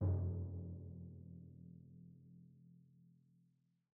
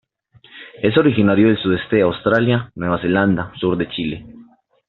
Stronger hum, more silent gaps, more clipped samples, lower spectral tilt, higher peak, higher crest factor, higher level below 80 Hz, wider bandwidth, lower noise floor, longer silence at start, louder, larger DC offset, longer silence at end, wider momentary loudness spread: neither; neither; neither; first, -13 dB/octave vs -5.5 dB/octave; second, -28 dBFS vs -2 dBFS; about the same, 18 dB vs 16 dB; second, -66 dBFS vs -50 dBFS; second, 1.7 kHz vs 4.3 kHz; first, -78 dBFS vs -51 dBFS; second, 0 s vs 0.55 s; second, -48 LUFS vs -17 LUFS; neither; first, 0.85 s vs 0.45 s; first, 24 LU vs 9 LU